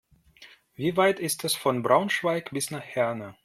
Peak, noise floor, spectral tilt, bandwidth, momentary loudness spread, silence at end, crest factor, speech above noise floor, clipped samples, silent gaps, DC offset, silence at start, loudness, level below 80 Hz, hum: -6 dBFS; -54 dBFS; -4 dB/octave; 16.5 kHz; 8 LU; 0.1 s; 22 dB; 28 dB; under 0.1%; none; under 0.1%; 0.4 s; -26 LUFS; -68 dBFS; none